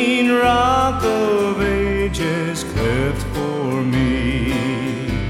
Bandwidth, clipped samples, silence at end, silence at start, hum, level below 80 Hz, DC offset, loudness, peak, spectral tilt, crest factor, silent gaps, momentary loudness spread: 16 kHz; under 0.1%; 0 s; 0 s; none; -30 dBFS; under 0.1%; -18 LUFS; -4 dBFS; -5.5 dB/octave; 14 dB; none; 7 LU